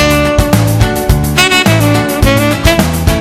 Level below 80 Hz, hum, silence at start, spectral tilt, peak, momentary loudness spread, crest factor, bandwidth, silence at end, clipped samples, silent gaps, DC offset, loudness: -18 dBFS; none; 0 s; -5 dB/octave; 0 dBFS; 4 LU; 10 dB; 18 kHz; 0 s; 0.3%; none; under 0.1%; -9 LUFS